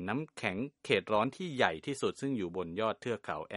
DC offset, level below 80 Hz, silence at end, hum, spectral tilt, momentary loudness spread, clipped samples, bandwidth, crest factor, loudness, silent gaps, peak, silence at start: under 0.1%; -70 dBFS; 0 s; none; -5 dB/octave; 7 LU; under 0.1%; 11.5 kHz; 24 dB; -34 LUFS; none; -10 dBFS; 0 s